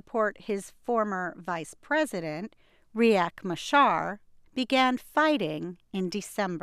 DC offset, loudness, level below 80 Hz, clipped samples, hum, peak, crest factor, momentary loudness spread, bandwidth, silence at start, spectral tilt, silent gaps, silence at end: under 0.1%; -28 LUFS; -66 dBFS; under 0.1%; none; -10 dBFS; 18 dB; 13 LU; 15.5 kHz; 0.15 s; -4.5 dB/octave; none; 0.05 s